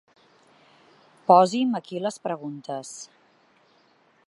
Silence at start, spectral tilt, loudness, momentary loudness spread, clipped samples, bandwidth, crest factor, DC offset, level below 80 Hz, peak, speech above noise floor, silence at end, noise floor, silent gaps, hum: 1.3 s; -5.5 dB/octave; -24 LUFS; 21 LU; under 0.1%; 11.5 kHz; 24 dB; under 0.1%; -84 dBFS; -4 dBFS; 39 dB; 1.2 s; -62 dBFS; none; none